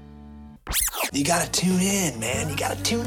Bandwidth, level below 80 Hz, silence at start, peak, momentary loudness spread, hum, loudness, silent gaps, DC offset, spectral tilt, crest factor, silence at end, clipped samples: 19 kHz; -42 dBFS; 0 s; -10 dBFS; 5 LU; none; -23 LUFS; none; under 0.1%; -3.5 dB/octave; 16 dB; 0 s; under 0.1%